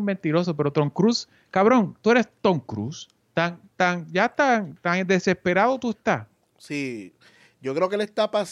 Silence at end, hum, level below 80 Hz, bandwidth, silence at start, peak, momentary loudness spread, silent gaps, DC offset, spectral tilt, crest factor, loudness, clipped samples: 0 s; none; -66 dBFS; 11.5 kHz; 0 s; -6 dBFS; 11 LU; none; under 0.1%; -6 dB/octave; 18 dB; -23 LUFS; under 0.1%